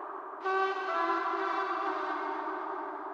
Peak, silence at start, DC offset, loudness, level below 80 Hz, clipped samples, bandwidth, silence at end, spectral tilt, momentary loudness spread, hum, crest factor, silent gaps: -18 dBFS; 0 s; under 0.1%; -33 LUFS; -88 dBFS; under 0.1%; 7.8 kHz; 0 s; -3 dB/octave; 7 LU; none; 16 dB; none